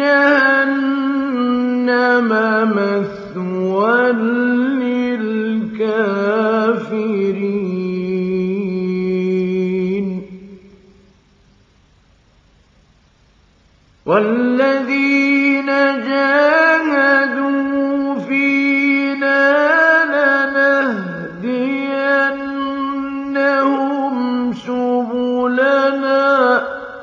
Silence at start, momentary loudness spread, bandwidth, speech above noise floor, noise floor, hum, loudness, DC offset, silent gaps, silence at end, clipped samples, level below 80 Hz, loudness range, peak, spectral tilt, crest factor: 0 s; 9 LU; 7 kHz; 37 dB; -53 dBFS; none; -16 LUFS; under 0.1%; none; 0 s; under 0.1%; -58 dBFS; 7 LU; -2 dBFS; -7 dB/octave; 14 dB